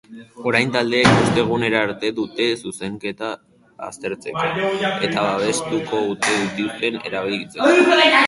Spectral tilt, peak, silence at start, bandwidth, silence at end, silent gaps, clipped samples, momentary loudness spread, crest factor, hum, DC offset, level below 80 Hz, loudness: -4.5 dB/octave; 0 dBFS; 0.1 s; 11.5 kHz; 0 s; none; under 0.1%; 14 LU; 20 dB; none; under 0.1%; -52 dBFS; -19 LUFS